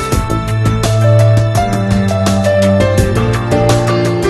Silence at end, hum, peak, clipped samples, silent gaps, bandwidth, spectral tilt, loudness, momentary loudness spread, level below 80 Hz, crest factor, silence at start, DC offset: 0 s; none; 0 dBFS; under 0.1%; none; 13 kHz; -6.5 dB/octave; -12 LUFS; 5 LU; -26 dBFS; 10 dB; 0 s; under 0.1%